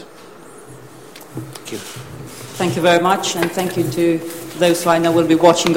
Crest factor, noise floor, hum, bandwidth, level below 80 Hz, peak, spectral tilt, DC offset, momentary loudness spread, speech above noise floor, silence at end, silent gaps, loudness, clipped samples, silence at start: 18 dB; -40 dBFS; none; 16.5 kHz; -54 dBFS; 0 dBFS; -4.5 dB/octave; 0.4%; 20 LU; 23 dB; 0 s; none; -16 LUFS; under 0.1%; 0 s